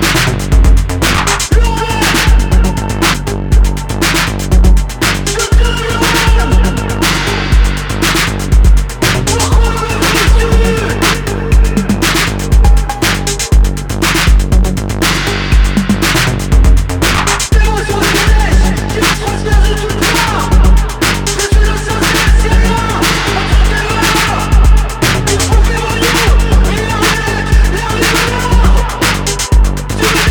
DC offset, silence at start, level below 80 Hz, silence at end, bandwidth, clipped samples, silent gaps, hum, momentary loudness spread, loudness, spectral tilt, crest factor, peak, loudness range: under 0.1%; 0 s; -12 dBFS; 0 s; over 20 kHz; under 0.1%; none; none; 3 LU; -11 LUFS; -4 dB/octave; 10 dB; 0 dBFS; 1 LU